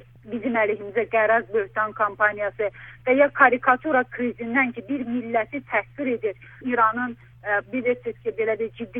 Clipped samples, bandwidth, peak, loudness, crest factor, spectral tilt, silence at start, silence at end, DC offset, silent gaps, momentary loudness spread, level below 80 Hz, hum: under 0.1%; 3.8 kHz; -2 dBFS; -23 LUFS; 22 dB; -8.5 dB/octave; 0.25 s; 0 s; under 0.1%; none; 10 LU; -58 dBFS; none